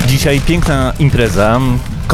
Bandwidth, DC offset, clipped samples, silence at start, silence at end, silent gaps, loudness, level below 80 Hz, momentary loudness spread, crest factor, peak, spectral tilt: 15.5 kHz; under 0.1%; under 0.1%; 0 s; 0 s; none; -12 LUFS; -20 dBFS; 3 LU; 10 dB; 0 dBFS; -6 dB/octave